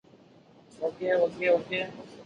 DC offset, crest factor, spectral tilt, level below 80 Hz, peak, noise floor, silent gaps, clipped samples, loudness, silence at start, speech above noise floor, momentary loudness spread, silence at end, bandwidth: under 0.1%; 18 dB; -5.5 dB/octave; -70 dBFS; -12 dBFS; -56 dBFS; none; under 0.1%; -28 LUFS; 0.8 s; 28 dB; 10 LU; 0 s; 7.8 kHz